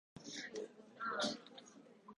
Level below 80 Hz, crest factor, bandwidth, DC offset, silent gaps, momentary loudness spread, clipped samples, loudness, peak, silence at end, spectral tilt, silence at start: -84 dBFS; 22 dB; 11 kHz; under 0.1%; none; 19 LU; under 0.1%; -44 LUFS; -26 dBFS; 0.05 s; -2.5 dB/octave; 0.15 s